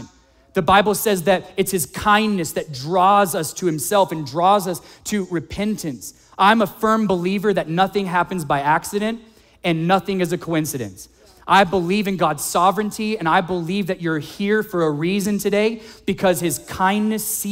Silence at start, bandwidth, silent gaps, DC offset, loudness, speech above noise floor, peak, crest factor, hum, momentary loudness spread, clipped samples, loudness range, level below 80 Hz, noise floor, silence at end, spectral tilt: 0 s; 16.5 kHz; none; under 0.1%; -19 LUFS; 31 dB; -2 dBFS; 16 dB; none; 11 LU; under 0.1%; 2 LU; -50 dBFS; -50 dBFS; 0 s; -4.5 dB/octave